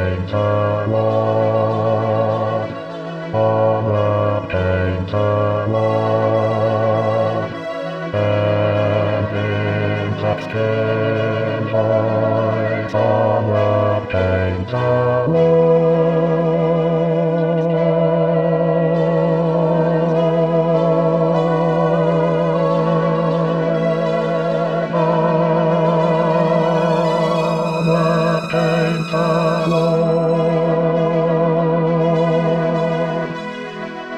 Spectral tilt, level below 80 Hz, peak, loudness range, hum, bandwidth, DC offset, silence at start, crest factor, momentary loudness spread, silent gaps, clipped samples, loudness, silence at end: -8 dB/octave; -52 dBFS; -4 dBFS; 3 LU; none; 8.4 kHz; 0.3%; 0 s; 12 dB; 4 LU; none; under 0.1%; -17 LUFS; 0 s